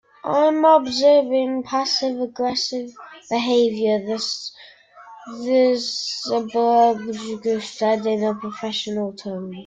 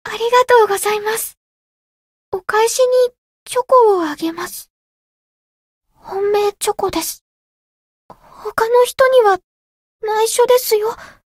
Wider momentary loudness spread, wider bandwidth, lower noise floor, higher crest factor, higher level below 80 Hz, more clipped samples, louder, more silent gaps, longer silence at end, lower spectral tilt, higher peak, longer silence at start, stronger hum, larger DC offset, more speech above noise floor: second, 13 LU vs 16 LU; second, 9.2 kHz vs 16 kHz; second, -44 dBFS vs under -90 dBFS; about the same, 18 dB vs 16 dB; second, -66 dBFS vs -56 dBFS; neither; second, -20 LUFS vs -15 LUFS; second, none vs 1.37-2.32 s, 3.18-3.46 s, 4.70-5.81 s, 7.21-8.09 s, 9.44-10.00 s; second, 0.05 s vs 0.25 s; first, -4 dB/octave vs -1.5 dB/octave; about the same, -2 dBFS vs 0 dBFS; first, 0.25 s vs 0.05 s; neither; neither; second, 24 dB vs over 75 dB